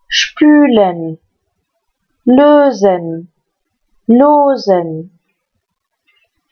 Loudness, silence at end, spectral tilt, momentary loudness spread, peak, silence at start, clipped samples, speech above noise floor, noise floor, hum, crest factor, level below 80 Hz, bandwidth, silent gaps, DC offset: -10 LUFS; 1.45 s; -5 dB/octave; 17 LU; 0 dBFS; 0.1 s; under 0.1%; 62 dB; -71 dBFS; none; 12 dB; -56 dBFS; 6.8 kHz; none; under 0.1%